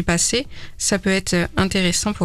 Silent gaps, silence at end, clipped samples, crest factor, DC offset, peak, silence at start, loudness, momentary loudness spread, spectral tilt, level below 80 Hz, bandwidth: none; 0 s; under 0.1%; 16 dB; under 0.1%; -4 dBFS; 0 s; -19 LUFS; 5 LU; -3.5 dB/octave; -36 dBFS; 14.5 kHz